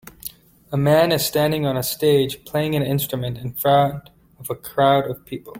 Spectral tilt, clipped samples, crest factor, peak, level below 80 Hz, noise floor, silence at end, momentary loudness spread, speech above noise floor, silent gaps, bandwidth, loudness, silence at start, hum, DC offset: -5.5 dB/octave; under 0.1%; 18 dB; -2 dBFS; -52 dBFS; -39 dBFS; 0 s; 15 LU; 20 dB; none; 17 kHz; -20 LUFS; 0.25 s; none; under 0.1%